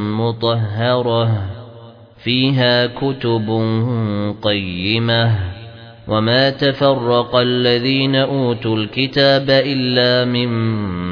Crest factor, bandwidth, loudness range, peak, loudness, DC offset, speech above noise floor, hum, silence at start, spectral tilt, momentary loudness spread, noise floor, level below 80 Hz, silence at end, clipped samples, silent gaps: 16 dB; 5.4 kHz; 3 LU; 0 dBFS; -16 LUFS; under 0.1%; 24 dB; none; 0 s; -8 dB/octave; 7 LU; -39 dBFS; -50 dBFS; 0 s; under 0.1%; none